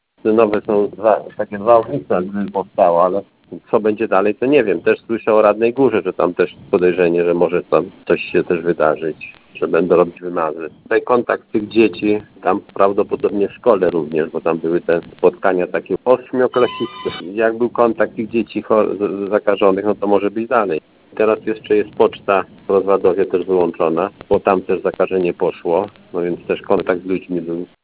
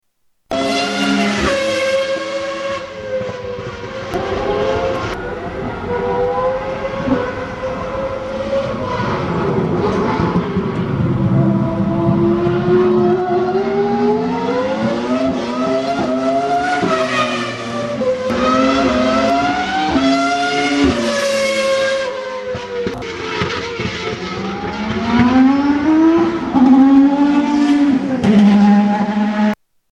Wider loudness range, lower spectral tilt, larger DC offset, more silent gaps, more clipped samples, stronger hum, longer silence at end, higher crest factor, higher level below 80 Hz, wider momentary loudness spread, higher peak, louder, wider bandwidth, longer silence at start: second, 2 LU vs 8 LU; first, -10.5 dB/octave vs -6 dB/octave; neither; neither; neither; neither; second, 0.2 s vs 0.4 s; about the same, 16 dB vs 16 dB; second, -54 dBFS vs -40 dBFS; second, 7 LU vs 11 LU; about the same, 0 dBFS vs 0 dBFS; about the same, -17 LUFS vs -16 LUFS; second, 4 kHz vs 12 kHz; second, 0.25 s vs 0.5 s